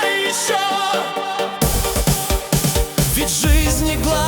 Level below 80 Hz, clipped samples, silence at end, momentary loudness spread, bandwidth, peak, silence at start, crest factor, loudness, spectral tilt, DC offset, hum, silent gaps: -24 dBFS; under 0.1%; 0 s; 4 LU; over 20 kHz; -2 dBFS; 0 s; 14 dB; -18 LUFS; -3.5 dB/octave; under 0.1%; none; none